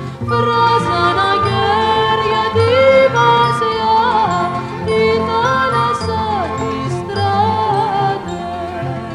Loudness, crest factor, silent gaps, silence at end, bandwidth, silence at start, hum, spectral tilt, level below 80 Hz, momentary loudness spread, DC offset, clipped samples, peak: -14 LUFS; 14 dB; none; 0 s; 11.5 kHz; 0 s; none; -5.5 dB/octave; -42 dBFS; 9 LU; under 0.1%; under 0.1%; 0 dBFS